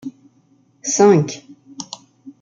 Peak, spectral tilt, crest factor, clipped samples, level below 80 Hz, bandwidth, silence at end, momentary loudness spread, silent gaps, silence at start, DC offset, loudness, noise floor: -2 dBFS; -5 dB/octave; 18 dB; under 0.1%; -66 dBFS; 8.8 kHz; 0.1 s; 23 LU; none; 0.05 s; under 0.1%; -16 LUFS; -57 dBFS